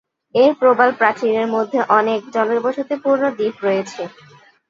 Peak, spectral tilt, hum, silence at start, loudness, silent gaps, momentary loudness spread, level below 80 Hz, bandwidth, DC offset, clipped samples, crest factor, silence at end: 0 dBFS; -5.5 dB/octave; none; 0.35 s; -17 LUFS; none; 8 LU; -70 dBFS; 7.6 kHz; under 0.1%; under 0.1%; 18 dB; 0.6 s